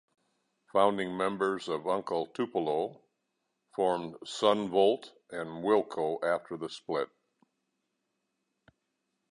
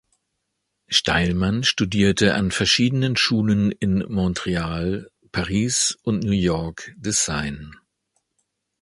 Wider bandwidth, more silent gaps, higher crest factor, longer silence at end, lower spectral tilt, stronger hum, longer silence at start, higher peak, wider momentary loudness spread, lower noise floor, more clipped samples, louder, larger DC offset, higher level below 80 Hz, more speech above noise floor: about the same, 11 kHz vs 11.5 kHz; neither; about the same, 22 dB vs 20 dB; first, 2.25 s vs 1.1 s; about the same, -5 dB/octave vs -4 dB/octave; neither; second, 0.75 s vs 0.9 s; second, -10 dBFS vs -2 dBFS; first, 13 LU vs 10 LU; first, -82 dBFS vs -77 dBFS; neither; second, -31 LUFS vs -21 LUFS; neither; second, -74 dBFS vs -42 dBFS; second, 52 dB vs 56 dB